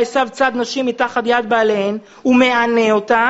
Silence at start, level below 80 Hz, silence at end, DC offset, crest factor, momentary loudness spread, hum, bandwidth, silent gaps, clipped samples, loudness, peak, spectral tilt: 0 s; -56 dBFS; 0 s; under 0.1%; 14 dB; 7 LU; none; 8 kHz; none; under 0.1%; -16 LUFS; 0 dBFS; -2 dB/octave